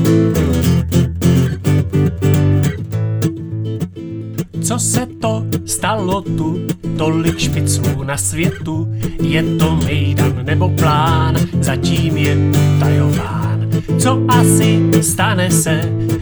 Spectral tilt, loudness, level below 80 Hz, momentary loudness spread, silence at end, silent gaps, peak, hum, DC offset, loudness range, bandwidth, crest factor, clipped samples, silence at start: -5.5 dB/octave; -15 LUFS; -34 dBFS; 8 LU; 0 s; none; 0 dBFS; none; under 0.1%; 5 LU; over 20 kHz; 14 dB; under 0.1%; 0 s